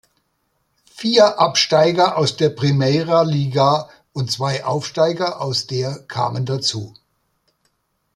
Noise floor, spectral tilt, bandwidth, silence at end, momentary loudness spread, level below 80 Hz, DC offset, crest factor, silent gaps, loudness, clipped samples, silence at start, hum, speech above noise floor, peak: -68 dBFS; -5 dB/octave; 12.5 kHz; 1.25 s; 10 LU; -58 dBFS; under 0.1%; 18 dB; none; -18 LUFS; under 0.1%; 0.95 s; none; 51 dB; -2 dBFS